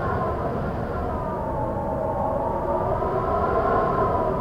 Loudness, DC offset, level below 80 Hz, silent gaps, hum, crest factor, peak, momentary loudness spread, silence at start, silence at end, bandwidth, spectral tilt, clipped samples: -25 LUFS; under 0.1%; -36 dBFS; none; none; 16 dB; -8 dBFS; 6 LU; 0 s; 0 s; 16 kHz; -9 dB/octave; under 0.1%